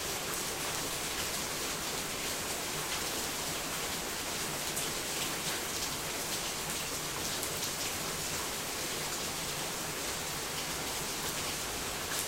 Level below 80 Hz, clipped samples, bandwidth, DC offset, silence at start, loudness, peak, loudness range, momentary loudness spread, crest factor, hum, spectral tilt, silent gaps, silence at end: -56 dBFS; under 0.1%; 16 kHz; under 0.1%; 0 s; -34 LUFS; -12 dBFS; 1 LU; 1 LU; 24 dB; none; -1.5 dB/octave; none; 0 s